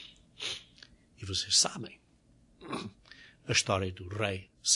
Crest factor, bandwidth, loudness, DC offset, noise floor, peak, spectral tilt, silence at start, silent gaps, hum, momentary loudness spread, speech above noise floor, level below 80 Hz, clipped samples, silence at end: 22 dB; 11 kHz; -31 LUFS; under 0.1%; -64 dBFS; -12 dBFS; -2 dB/octave; 0 s; none; none; 22 LU; 33 dB; -66 dBFS; under 0.1%; 0 s